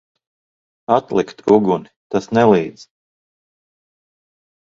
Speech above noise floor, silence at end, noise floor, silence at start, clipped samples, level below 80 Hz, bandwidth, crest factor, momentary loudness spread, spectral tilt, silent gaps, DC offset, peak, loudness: over 74 dB; 1.85 s; under -90 dBFS; 0.9 s; under 0.1%; -58 dBFS; 7.6 kHz; 20 dB; 10 LU; -7 dB/octave; 1.96-2.10 s; under 0.1%; 0 dBFS; -17 LUFS